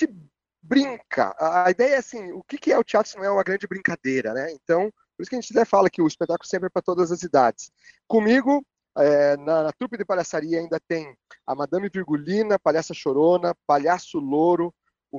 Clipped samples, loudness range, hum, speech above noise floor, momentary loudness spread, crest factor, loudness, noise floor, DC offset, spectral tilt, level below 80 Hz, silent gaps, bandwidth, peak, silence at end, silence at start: under 0.1%; 3 LU; none; 31 dB; 11 LU; 18 dB; -22 LUFS; -53 dBFS; under 0.1%; -5.5 dB/octave; -66 dBFS; none; 7.6 kHz; -4 dBFS; 0 s; 0 s